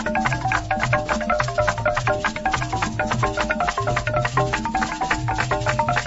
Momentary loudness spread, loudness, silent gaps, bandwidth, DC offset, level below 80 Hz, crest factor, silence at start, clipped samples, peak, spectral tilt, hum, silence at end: 2 LU; -22 LUFS; none; 8 kHz; under 0.1%; -36 dBFS; 16 dB; 0 s; under 0.1%; -6 dBFS; -5 dB/octave; none; 0 s